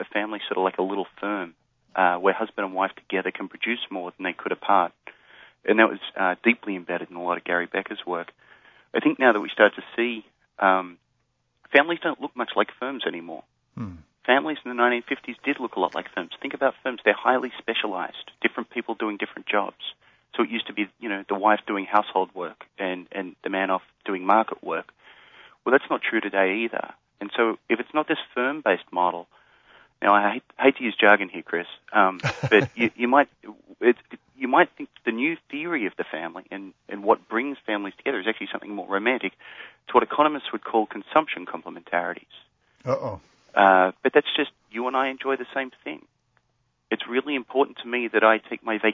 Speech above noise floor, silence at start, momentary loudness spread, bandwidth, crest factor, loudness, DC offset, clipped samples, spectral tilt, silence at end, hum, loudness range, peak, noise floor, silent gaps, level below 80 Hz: 48 dB; 0 s; 13 LU; 7.4 kHz; 24 dB; -24 LUFS; under 0.1%; under 0.1%; -6 dB/octave; 0 s; none; 5 LU; -2 dBFS; -72 dBFS; none; -68 dBFS